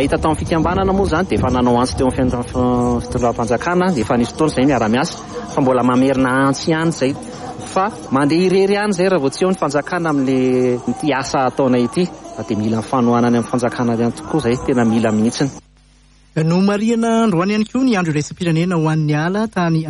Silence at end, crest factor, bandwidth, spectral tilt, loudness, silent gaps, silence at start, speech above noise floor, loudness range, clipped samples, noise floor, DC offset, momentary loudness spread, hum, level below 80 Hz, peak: 0 s; 12 dB; 11.5 kHz; -6 dB/octave; -17 LUFS; none; 0 s; 33 dB; 1 LU; under 0.1%; -49 dBFS; under 0.1%; 5 LU; none; -38 dBFS; -4 dBFS